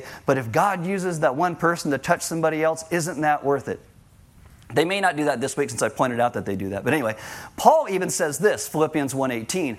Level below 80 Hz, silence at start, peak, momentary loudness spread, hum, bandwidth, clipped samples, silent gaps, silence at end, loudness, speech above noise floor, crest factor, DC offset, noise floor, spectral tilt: -58 dBFS; 0 s; 0 dBFS; 6 LU; none; 16.5 kHz; under 0.1%; none; 0 s; -23 LUFS; 29 dB; 22 dB; under 0.1%; -51 dBFS; -4.5 dB/octave